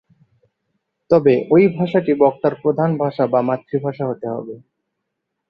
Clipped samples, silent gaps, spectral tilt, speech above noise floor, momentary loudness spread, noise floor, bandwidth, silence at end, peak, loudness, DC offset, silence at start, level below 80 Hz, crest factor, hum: under 0.1%; none; -10 dB/octave; 60 dB; 11 LU; -77 dBFS; 5.8 kHz; 0.9 s; -2 dBFS; -17 LUFS; under 0.1%; 1.1 s; -60 dBFS; 18 dB; none